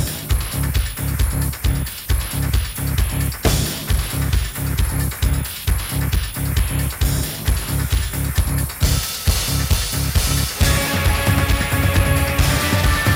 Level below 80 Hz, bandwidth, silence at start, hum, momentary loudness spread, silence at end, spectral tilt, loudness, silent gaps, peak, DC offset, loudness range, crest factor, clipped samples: -22 dBFS; 19.5 kHz; 0 s; none; 5 LU; 0 s; -4 dB/octave; -20 LUFS; none; -2 dBFS; under 0.1%; 4 LU; 16 dB; under 0.1%